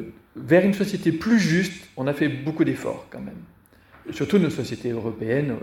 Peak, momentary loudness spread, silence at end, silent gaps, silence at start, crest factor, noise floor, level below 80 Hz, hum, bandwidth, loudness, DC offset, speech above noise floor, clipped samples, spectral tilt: -4 dBFS; 18 LU; 0 s; none; 0 s; 20 dB; -52 dBFS; -56 dBFS; none; 16.5 kHz; -23 LUFS; under 0.1%; 29 dB; under 0.1%; -6.5 dB/octave